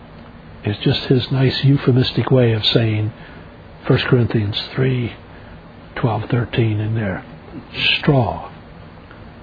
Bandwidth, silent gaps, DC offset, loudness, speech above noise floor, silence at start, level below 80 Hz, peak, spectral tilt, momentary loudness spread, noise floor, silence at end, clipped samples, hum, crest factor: 5 kHz; none; under 0.1%; -18 LUFS; 22 dB; 0 s; -44 dBFS; 0 dBFS; -8.5 dB/octave; 21 LU; -39 dBFS; 0 s; under 0.1%; none; 18 dB